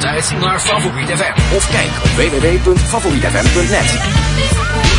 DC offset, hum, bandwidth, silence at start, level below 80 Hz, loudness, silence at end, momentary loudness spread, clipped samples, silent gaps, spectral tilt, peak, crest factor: under 0.1%; none; 11 kHz; 0 s; -20 dBFS; -13 LUFS; 0 s; 2 LU; under 0.1%; none; -4 dB/octave; 0 dBFS; 12 dB